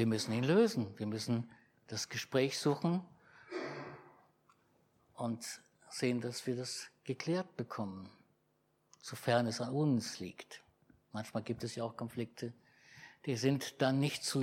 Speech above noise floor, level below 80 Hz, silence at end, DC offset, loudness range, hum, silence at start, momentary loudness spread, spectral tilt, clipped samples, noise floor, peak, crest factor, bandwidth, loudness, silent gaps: 41 dB; -80 dBFS; 0 s; under 0.1%; 6 LU; none; 0 s; 16 LU; -5 dB/octave; under 0.1%; -77 dBFS; -18 dBFS; 20 dB; 16.5 kHz; -37 LUFS; none